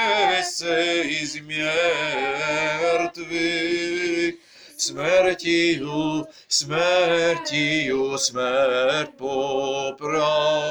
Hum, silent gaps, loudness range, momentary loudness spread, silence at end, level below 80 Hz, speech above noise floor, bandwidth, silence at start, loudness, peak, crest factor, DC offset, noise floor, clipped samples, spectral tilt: none; none; 2 LU; 7 LU; 0 s; -60 dBFS; 20 dB; over 20 kHz; 0 s; -22 LUFS; -6 dBFS; 16 dB; under 0.1%; -42 dBFS; under 0.1%; -3 dB/octave